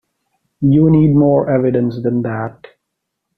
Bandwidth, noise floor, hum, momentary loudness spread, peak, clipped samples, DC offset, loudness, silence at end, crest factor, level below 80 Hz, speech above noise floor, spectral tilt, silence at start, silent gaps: 4.7 kHz; -75 dBFS; none; 11 LU; -2 dBFS; under 0.1%; under 0.1%; -14 LUFS; 0.85 s; 12 dB; -44 dBFS; 63 dB; -12 dB/octave; 0.6 s; none